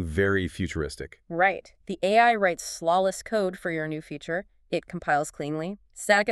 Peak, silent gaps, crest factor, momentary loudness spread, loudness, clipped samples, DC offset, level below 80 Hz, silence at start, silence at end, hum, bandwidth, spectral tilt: -6 dBFS; none; 20 dB; 14 LU; -26 LUFS; under 0.1%; under 0.1%; -50 dBFS; 0 s; 0 s; none; 13.5 kHz; -4.5 dB/octave